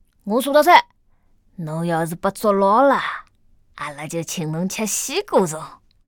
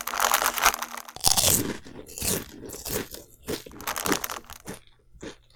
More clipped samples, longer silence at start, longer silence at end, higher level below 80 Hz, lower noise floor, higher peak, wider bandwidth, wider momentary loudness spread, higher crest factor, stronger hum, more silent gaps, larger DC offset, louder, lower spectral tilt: neither; first, 0.25 s vs 0 s; first, 0.35 s vs 0.2 s; second, -56 dBFS vs -48 dBFS; first, -57 dBFS vs -49 dBFS; about the same, 0 dBFS vs 0 dBFS; about the same, over 20 kHz vs over 20 kHz; second, 18 LU vs 21 LU; second, 20 dB vs 28 dB; neither; neither; neither; first, -19 LUFS vs -25 LUFS; first, -4 dB/octave vs -1.5 dB/octave